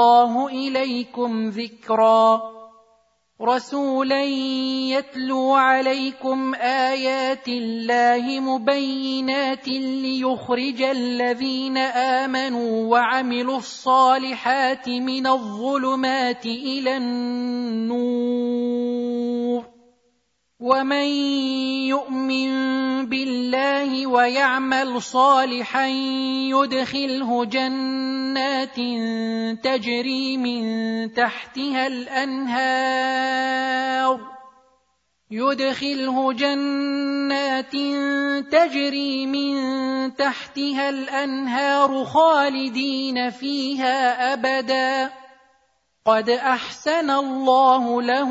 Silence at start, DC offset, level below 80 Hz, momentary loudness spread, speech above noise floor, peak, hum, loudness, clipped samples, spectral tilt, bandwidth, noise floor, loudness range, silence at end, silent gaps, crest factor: 0 s; under 0.1%; -72 dBFS; 7 LU; 49 dB; -4 dBFS; none; -21 LUFS; under 0.1%; -3.5 dB/octave; 7.8 kHz; -70 dBFS; 3 LU; 0 s; none; 18 dB